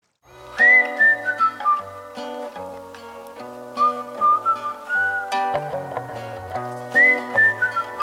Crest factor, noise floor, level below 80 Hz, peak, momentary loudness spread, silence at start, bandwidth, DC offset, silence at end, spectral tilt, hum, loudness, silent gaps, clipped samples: 16 dB; -45 dBFS; -62 dBFS; -6 dBFS; 22 LU; 0.35 s; 16 kHz; under 0.1%; 0 s; -4 dB/octave; none; -18 LUFS; none; under 0.1%